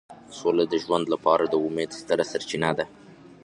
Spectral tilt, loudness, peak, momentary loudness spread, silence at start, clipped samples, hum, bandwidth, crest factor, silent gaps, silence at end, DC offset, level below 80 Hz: -5 dB/octave; -25 LUFS; -6 dBFS; 9 LU; 0.1 s; under 0.1%; none; 11 kHz; 20 dB; none; 0.1 s; under 0.1%; -62 dBFS